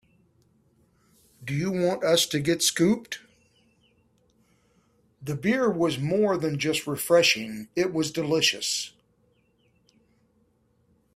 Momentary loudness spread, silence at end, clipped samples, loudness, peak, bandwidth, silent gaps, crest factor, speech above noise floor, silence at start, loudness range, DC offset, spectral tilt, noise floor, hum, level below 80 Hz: 11 LU; 2.25 s; under 0.1%; -24 LUFS; -8 dBFS; 16 kHz; none; 20 dB; 42 dB; 1.4 s; 5 LU; under 0.1%; -3.5 dB/octave; -67 dBFS; none; -64 dBFS